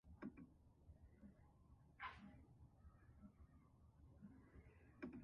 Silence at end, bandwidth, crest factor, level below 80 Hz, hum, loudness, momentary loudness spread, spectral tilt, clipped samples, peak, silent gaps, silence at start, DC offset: 0 s; 5.6 kHz; 22 dB; -72 dBFS; none; -63 LUFS; 12 LU; -5.5 dB/octave; under 0.1%; -40 dBFS; none; 0.05 s; under 0.1%